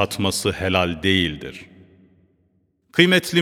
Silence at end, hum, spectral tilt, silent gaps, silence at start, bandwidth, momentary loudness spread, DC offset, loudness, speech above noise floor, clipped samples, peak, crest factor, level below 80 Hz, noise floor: 0 s; none; -4.5 dB/octave; none; 0 s; 18 kHz; 18 LU; under 0.1%; -19 LUFS; 45 dB; under 0.1%; 0 dBFS; 22 dB; -48 dBFS; -65 dBFS